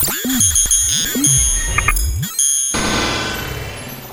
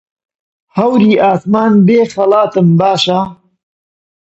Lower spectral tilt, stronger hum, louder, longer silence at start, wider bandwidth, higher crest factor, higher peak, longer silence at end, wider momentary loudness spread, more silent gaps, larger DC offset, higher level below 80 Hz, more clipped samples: second, -2 dB/octave vs -7 dB/octave; neither; second, -14 LUFS vs -10 LUFS; second, 0 s vs 0.75 s; first, 17.5 kHz vs 8.2 kHz; about the same, 16 dB vs 12 dB; about the same, 0 dBFS vs 0 dBFS; second, 0 s vs 1 s; first, 13 LU vs 7 LU; neither; neither; first, -26 dBFS vs -54 dBFS; neither